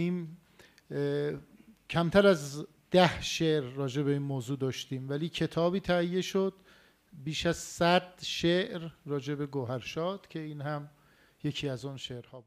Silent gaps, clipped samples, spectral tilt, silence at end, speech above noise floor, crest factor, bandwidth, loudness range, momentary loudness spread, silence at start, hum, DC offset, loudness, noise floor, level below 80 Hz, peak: none; under 0.1%; -5.5 dB/octave; 0.05 s; 31 dB; 24 dB; 15 kHz; 6 LU; 15 LU; 0 s; none; under 0.1%; -31 LUFS; -61 dBFS; -60 dBFS; -6 dBFS